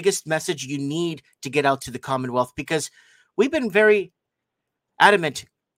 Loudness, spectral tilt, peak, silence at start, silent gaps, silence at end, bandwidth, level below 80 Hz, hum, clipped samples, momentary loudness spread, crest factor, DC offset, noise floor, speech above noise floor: -22 LUFS; -4 dB/octave; 0 dBFS; 0 s; none; 0.35 s; 16.5 kHz; -62 dBFS; none; under 0.1%; 14 LU; 22 dB; under 0.1%; -82 dBFS; 60 dB